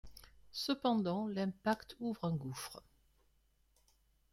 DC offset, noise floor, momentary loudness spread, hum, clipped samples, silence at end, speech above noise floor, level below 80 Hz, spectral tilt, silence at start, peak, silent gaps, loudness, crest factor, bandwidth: under 0.1%; -74 dBFS; 13 LU; none; under 0.1%; 1.55 s; 36 dB; -68 dBFS; -5.5 dB/octave; 0.05 s; -22 dBFS; none; -38 LUFS; 18 dB; 16 kHz